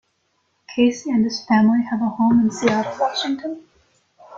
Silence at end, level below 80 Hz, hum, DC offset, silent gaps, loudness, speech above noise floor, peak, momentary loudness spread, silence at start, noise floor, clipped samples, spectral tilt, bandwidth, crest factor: 0 s; -60 dBFS; none; under 0.1%; none; -19 LUFS; 49 dB; -2 dBFS; 11 LU; 0.7 s; -68 dBFS; under 0.1%; -5.5 dB/octave; 7.6 kHz; 18 dB